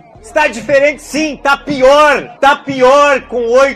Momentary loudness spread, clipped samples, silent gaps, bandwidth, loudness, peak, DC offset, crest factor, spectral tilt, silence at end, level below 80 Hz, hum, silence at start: 7 LU; under 0.1%; none; 13 kHz; -10 LUFS; 0 dBFS; under 0.1%; 10 dB; -3.5 dB/octave; 0 s; -40 dBFS; none; 0.25 s